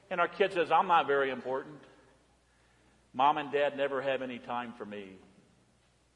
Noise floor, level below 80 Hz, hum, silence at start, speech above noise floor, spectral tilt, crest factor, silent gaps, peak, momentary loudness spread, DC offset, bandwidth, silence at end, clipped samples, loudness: -68 dBFS; -74 dBFS; none; 0.1 s; 37 dB; -5.5 dB/octave; 20 dB; none; -12 dBFS; 17 LU; under 0.1%; 11 kHz; 1 s; under 0.1%; -30 LUFS